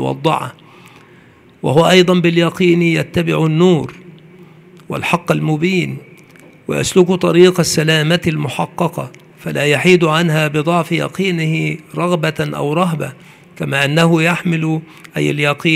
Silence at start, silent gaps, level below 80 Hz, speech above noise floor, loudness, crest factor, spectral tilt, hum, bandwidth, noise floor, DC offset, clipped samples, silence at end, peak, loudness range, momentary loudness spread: 0 s; none; -52 dBFS; 31 dB; -14 LUFS; 16 dB; -5.5 dB/octave; none; 15.5 kHz; -45 dBFS; under 0.1%; under 0.1%; 0 s; 0 dBFS; 4 LU; 13 LU